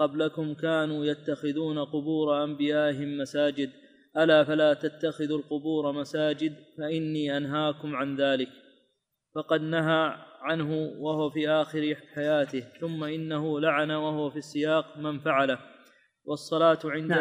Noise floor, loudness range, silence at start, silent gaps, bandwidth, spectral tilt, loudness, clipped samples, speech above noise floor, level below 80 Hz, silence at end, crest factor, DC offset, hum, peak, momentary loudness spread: -76 dBFS; 3 LU; 0 s; none; 10.5 kHz; -6.5 dB/octave; -28 LUFS; under 0.1%; 49 dB; -76 dBFS; 0 s; 18 dB; under 0.1%; none; -10 dBFS; 9 LU